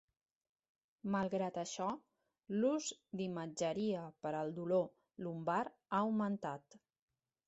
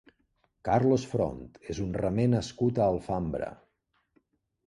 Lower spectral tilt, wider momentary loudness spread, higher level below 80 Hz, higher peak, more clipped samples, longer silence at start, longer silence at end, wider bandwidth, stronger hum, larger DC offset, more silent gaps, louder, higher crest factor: second, -5.5 dB/octave vs -7.5 dB/octave; second, 10 LU vs 13 LU; second, -80 dBFS vs -50 dBFS; second, -22 dBFS vs -12 dBFS; neither; first, 1.05 s vs 0.65 s; second, 0.7 s vs 1.15 s; second, 8 kHz vs 11 kHz; neither; neither; neither; second, -40 LUFS vs -29 LUFS; about the same, 18 dB vs 18 dB